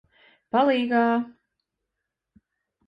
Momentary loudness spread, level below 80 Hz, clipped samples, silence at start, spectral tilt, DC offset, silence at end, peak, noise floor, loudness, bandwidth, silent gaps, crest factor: 7 LU; -74 dBFS; under 0.1%; 0.55 s; -7 dB/octave; under 0.1%; 1.6 s; -8 dBFS; -83 dBFS; -23 LUFS; 5.4 kHz; none; 18 dB